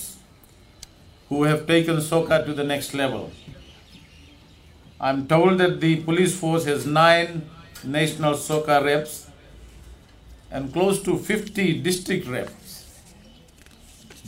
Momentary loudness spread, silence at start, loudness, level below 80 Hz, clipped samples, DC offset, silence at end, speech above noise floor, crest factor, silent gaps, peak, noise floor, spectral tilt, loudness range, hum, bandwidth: 18 LU; 0 s; -22 LUFS; -52 dBFS; under 0.1%; under 0.1%; 0 s; 29 dB; 22 dB; none; -2 dBFS; -51 dBFS; -5 dB/octave; 6 LU; none; 16 kHz